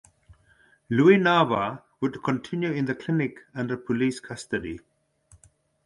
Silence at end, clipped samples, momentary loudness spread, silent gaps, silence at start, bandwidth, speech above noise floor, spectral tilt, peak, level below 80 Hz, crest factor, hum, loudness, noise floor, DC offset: 1.1 s; under 0.1%; 13 LU; none; 0.9 s; 11.5 kHz; 37 dB; -6.5 dB/octave; -6 dBFS; -60 dBFS; 20 dB; none; -25 LUFS; -61 dBFS; under 0.1%